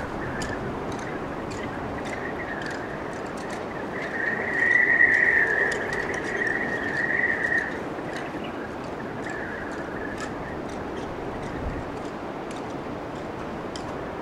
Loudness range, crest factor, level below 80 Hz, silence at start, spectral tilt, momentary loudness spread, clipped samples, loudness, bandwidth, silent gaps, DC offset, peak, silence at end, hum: 12 LU; 20 dB; -48 dBFS; 0 s; -5 dB/octave; 15 LU; under 0.1%; -26 LUFS; 15.5 kHz; none; under 0.1%; -8 dBFS; 0 s; none